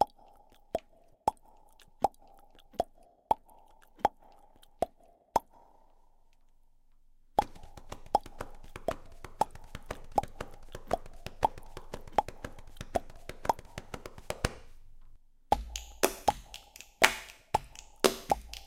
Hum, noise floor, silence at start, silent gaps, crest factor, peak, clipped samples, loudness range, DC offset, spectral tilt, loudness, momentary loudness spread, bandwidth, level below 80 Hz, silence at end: none; -61 dBFS; 0 s; none; 32 dB; -4 dBFS; under 0.1%; 7 LU; under 0.1%; -3 dB/octave; -34 LUFS; 18 LU; 16.5 kHz; -50 dBFS; 0 s